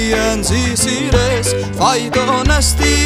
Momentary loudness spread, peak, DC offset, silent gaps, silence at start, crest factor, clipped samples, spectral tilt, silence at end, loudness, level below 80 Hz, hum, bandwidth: 3 LU; 0 dBFS; under 0.1%; none; 0 s; 14 dB; under 0.1%; -3.5 dB/octave; 0 s; -14 LUFS; -22 dBFS; none; 16 kHz